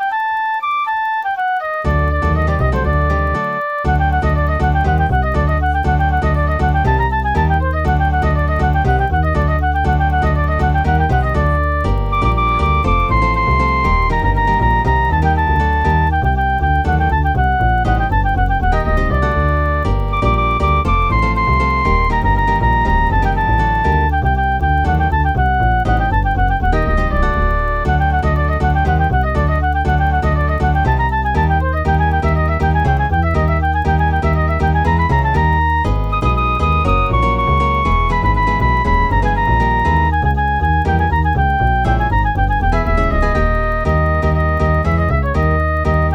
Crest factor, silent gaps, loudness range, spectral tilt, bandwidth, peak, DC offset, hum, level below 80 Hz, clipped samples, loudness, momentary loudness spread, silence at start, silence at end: 12 dB; none; 1 LU; -8 dB/octave; 7 kHz; -2 dBFS; under 0.1%; none; -18 dBFS; under 0.1%; -15 LUFS; 2 LU; 0 s; 0 s